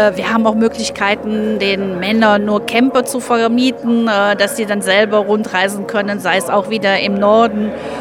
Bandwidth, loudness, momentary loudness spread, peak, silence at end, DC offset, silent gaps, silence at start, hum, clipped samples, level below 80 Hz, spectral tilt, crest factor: 16.5 kHz; -14 LUFS; 5 LU; 0 dBFS; 0 s; under 0.1%; none; 0 s; none; under 0.1%; -50 dBFS; -4.5 dB/octave; 14 dB